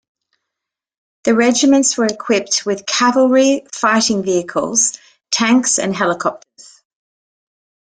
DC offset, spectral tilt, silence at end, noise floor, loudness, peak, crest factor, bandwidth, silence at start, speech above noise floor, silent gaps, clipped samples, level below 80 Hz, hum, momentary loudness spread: under 0.1%; -2.5 dB/octave; 1.6 s; -83 dBFS; -15 LUFS; -2 dBFS; 16 dB; 10 kHz; 1.25 s; 68 dB; none; under 0.1%; -60 dBFS; none; 6 LU